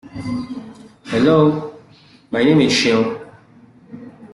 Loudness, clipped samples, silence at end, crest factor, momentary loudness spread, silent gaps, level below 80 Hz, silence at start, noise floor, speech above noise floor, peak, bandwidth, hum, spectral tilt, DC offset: -16 LUFS; under 0.1%; 0.05 s; 16 dB; 21 LU; none; -52 dBFS; 0.05 s; -48 dBFS; 33 dB; -2 dBFS; 12 kHz; none; -5.5 dB/octave; under 0.1%